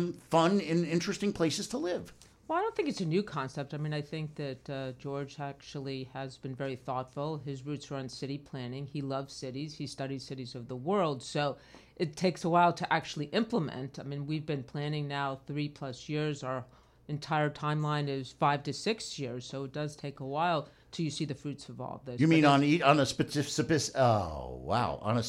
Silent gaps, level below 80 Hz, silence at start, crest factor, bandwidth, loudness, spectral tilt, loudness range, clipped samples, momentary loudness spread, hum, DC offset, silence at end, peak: none; -62 dBFS; 0 s; 24 dB; 14 kHz; -33 LUFS; -5.5 dB/octave; 11 LU; under 0.1%; 14 LU; none; under 0.1%; 0 s; -8 dBFS